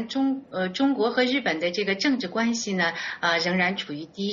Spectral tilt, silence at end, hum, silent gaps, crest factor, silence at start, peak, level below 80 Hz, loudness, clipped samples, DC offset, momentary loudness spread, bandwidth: -2.5 dB/octave; 0 s; none; none; 18 dB; 0 s; -8 dBFS; -66 dBFS; -25 LUFS; under 0.1%; under 0.1%; 6 LU; 7.4 kHz